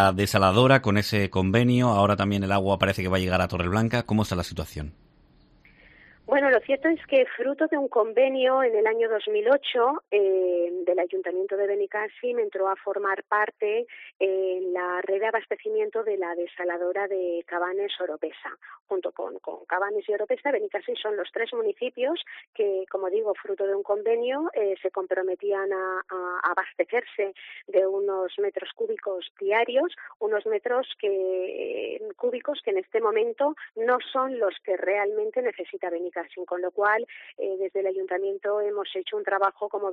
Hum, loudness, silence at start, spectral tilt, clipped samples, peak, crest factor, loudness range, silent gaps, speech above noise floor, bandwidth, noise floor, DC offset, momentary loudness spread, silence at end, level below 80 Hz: none; -26 LUFS; 0 s; -6 dB/octave; under 0.1%; -4 dBFS; 20 dB; 6 LU; 14.15-14.20 s, 18.81-18.85 s, 22.47-22.53 s, 29.30-29.35 s, 30.16-30.20 s; 32 dB; 13.5 kHz; -58 dBFS; under 0.1%; 9 LU; 0 s; -58 dBFS